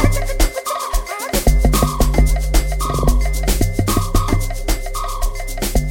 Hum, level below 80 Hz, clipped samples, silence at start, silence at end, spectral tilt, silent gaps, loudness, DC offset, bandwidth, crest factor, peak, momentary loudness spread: none; -18 dBFS; under 0.1%; 0 s; 0 s; -5 dB/octave; none; -19 LUFS; under 0.1%; 17 kHz; 14 dB; -2 dBFS; 7 LU